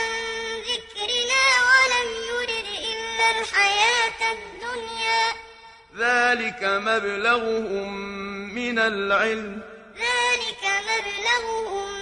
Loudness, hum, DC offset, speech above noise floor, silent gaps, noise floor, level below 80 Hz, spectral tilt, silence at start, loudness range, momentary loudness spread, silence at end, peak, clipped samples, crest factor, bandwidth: -22 LUFS; none; under 0.1%; 24 dB; none; -47 dBFS; -56 dBFS; -1 dB/octave; 0 s; 4 LU; 14 LU; 0 s; -6 dBFS; under 0.1%; 18 dB; 11 kHz